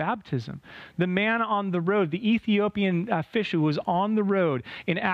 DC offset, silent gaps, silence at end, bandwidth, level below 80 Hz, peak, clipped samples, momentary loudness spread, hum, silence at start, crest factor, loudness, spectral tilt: under 0.1%; none; 0 s; 6.8 kHz; -64 dBFS; -10 dBFS; under 0.1%; 8 LU; none; 0 s; 16 dB; -26 LUFS; -8 dB/octave